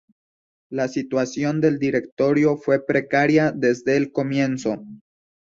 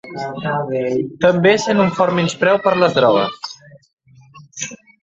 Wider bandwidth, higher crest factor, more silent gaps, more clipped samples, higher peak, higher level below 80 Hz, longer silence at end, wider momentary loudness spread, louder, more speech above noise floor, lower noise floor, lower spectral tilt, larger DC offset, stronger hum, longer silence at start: about the same, 7.6 kHz vs 8 kHz; about the same, 16 dB vs 16 dB; about the same, 2.12-2.17 s vs 3.93-3.97 s; neither; second, -4 dBFS vs 0 dBFS; about the same, -60 dBFS vs -56 dBFS; first, 0.5 s vs 0.25 s; second, 8 LU vs 14 LU; second, -21 LUFS vs -16 LUFS; first, over 70 dB vs 28 dB; first, under -90 dBFS vs -44 dBFS; first, -6.5 dB/octave vs -5 dB/octave; neither; neither; first, 0.7 s vs 0.05 s